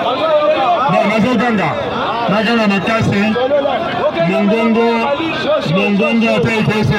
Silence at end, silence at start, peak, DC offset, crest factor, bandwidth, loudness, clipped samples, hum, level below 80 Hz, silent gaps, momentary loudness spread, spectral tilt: 0 s; 0 s; -2 dBFS; under 0.1%; 12 dB; 11.5 kHz; -14 LUFS; under 0.1%; none; -44 dBFS; none; 4 LU; -6.5 dB/octave